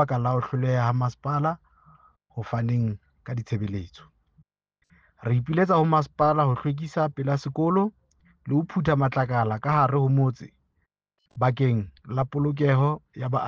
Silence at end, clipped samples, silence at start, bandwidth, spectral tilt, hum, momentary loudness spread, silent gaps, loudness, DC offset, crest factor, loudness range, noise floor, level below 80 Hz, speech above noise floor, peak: 0 s; under 0.1%; 0 s; 7 kHz; -9 dB/octave; none; 12 LU; none; -25 LUFS; under 0.1%; 16 dB; 6 LU; -75 dBFS; -56 dBFS; 51 dB; -8 dBFS